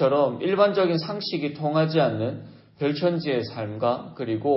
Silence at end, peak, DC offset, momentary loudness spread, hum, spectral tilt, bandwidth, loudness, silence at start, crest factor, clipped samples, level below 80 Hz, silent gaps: 0 s; -6 dBFS; under 0.1%; 9 LU; none; -10.5 dB/octave; 5.8 kHz; -24 LUFS; 0 s; 18 dB; under 0.1%; -66 dBFS; none